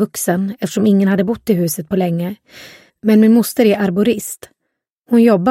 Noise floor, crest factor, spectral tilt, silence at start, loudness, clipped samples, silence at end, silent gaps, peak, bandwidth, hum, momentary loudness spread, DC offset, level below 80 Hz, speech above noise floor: -75 dBFS; 14 dB; -6 dB/octave; 0 s; -15 LUFS; under 0.1%; 0 s; 4.93-5.01 s; 0 dBFS; 16.5 kHz; none; 11 LU; under 0.1%; -56 dBFS; 61 dB